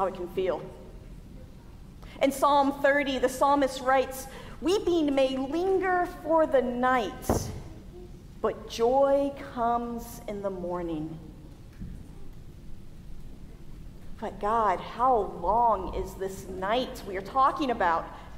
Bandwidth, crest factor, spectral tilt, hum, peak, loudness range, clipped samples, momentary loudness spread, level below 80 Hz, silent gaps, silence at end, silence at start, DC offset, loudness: 16 kHz; 18 dB; -5 dB/octave; none; -10 dBFS; 12 LU; under 0.1%; 24 LU; -46 dBFS; none; 0 s; 0 s; under 0.1%; -27 LUFS